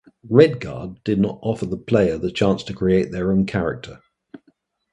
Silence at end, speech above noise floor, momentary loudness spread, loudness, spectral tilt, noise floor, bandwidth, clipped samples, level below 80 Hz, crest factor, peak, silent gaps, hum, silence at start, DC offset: 0.55 s; 43 dB; 14 LU; -20 LUFS; -7.5 dB/octave; -62 dBFS; 9.8 kHz; under 0.1%; -46 dBFS; 20 dB; 0 dBFS; none; none; 0.25 s; under 0.1%